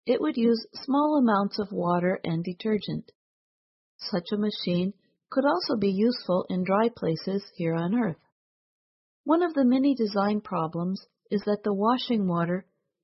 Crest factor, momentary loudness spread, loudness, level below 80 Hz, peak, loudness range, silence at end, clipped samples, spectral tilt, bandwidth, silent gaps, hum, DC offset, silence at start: 16 dB; 9 LU; -27 LUFS; -68 dBFS; -10 dBFS; 4 LU; 0.4 s; under 0.1%; -10 dB/octave; 6 kHz; 3.15-3.99 s, 8.32-9.24 s; none; under 0.1%; 0.05 s